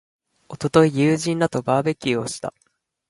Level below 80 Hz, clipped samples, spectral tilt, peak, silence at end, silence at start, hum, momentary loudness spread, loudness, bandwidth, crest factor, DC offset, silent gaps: -58 dBFS; under 0.1%; -6 dB/octave; -2 dBFS; 0.6 s; 0.5 s; none; 14 LU; -20 LUFS; 11.5 kHz; 20 dB; under 0.1%; none